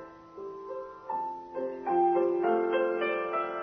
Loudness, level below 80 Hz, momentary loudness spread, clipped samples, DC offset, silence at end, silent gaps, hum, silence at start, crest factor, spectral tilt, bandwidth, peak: -30 LUFS; -72 dBFS; 16 LU; under 0.1%; under 0.1%; 0 s; none; none; 0 s; 16 dB; -7.5 dB/octave; 5.2 kHz; -14 dBFS